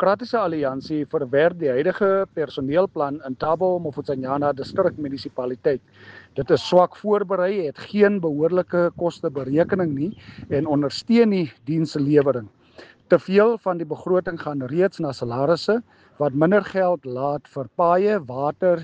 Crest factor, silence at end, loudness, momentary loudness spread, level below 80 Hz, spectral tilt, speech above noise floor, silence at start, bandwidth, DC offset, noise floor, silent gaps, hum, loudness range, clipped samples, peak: 18 dB; 0 s; -22 LUFS; 10 LU; -58 dBFS; -7.5 dB/octave; 27 dB; 0 s; 8.8 kHz; under 0.1%; -48 dBFS; none; none; 3 LU; under 0.1%; -4 dBFS